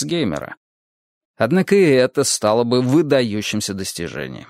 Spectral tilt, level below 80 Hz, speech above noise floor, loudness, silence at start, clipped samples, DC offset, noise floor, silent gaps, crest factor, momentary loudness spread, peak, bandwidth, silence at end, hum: -4.5 dB/octave; -54 dBFS; over 72 dB; -18 LUFS; 0 s; under 0.1%; under 0.1%; under -90 dBFS; 0.57-1.34 s; 18 dB; 12 LU; 0 dBFS; 16 kHz; 0.05 s; none